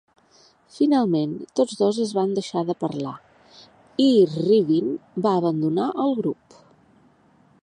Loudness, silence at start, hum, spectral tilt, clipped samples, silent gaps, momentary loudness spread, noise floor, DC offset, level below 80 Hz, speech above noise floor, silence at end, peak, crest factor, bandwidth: -22 LUFS; 0.75 s; none; -7 dB/octave; under 0.1%; none; 10 LU; -58 dBFS; under 0.1%; -70 dBFS; 36 dB; 1.3 s; -6 dBFS; 16 dB; 10.5 kHz